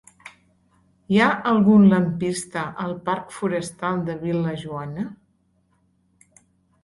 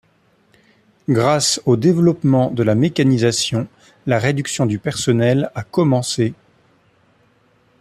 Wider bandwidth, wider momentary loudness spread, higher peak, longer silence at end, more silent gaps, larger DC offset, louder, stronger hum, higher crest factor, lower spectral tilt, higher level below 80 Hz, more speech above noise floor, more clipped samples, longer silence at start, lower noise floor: second, 11.5 kHz vs 14 kHz; first, 16 LU vs 7 LU; second, -6 dBFS vs -2 dBFS; first, 1.7 s vs 1.45 s; neither; neither; second, -21 LUFS vs -17 LUFS; neither; about the same, 18 dB vs 16 dB; about the same, -6.5 dB/octave vs -5.5 dB/octave; about the same, -58 dBFS vs -54 dBFS; about the same, 44 dB vs 42 dB; neither; second, 0.25 s vs 1.1 s; first, -65 dBFS vs -58 dBFS